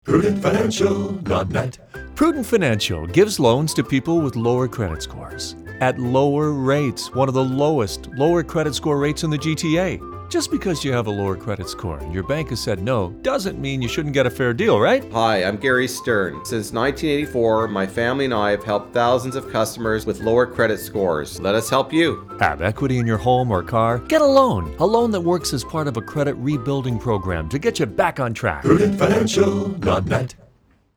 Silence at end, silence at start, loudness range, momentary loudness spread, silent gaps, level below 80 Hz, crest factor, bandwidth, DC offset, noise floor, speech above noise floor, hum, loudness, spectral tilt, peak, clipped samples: 0.6 s; 0.05 s; 4 LU; 7 LU; none; -42 dBFS; 20 dB; over 20 kHz; under 0.1%; -56 dBFS; 37 dB; none; -20 LUFS; -5.5 dB/octave; 0 dBFS; under 0.1%